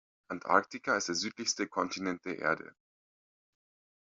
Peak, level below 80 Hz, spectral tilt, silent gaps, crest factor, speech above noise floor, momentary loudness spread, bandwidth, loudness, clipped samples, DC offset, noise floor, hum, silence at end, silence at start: -10 dBFS; -78 dBFS; -1.5 dB/octave; none; 26 dB; over 57 dB; 10 LU; 7.8 kHz; -33 LUFS; under 0.1%; under 0.1%; under -90 dBFS; none; 1.4 s; 0.3 s